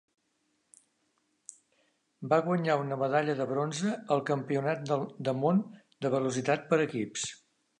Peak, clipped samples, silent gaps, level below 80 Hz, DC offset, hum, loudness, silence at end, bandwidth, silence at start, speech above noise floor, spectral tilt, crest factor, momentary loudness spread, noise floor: -12 dBFS; under 0.1%; none; -80 dBFS; under 0.1%; none; -30 LUFS; 0.45 s; 11 kHz; 2.2 s; 47 dB; -5.5 dB/octave; 20 dB; 12 LU; -76 dBFS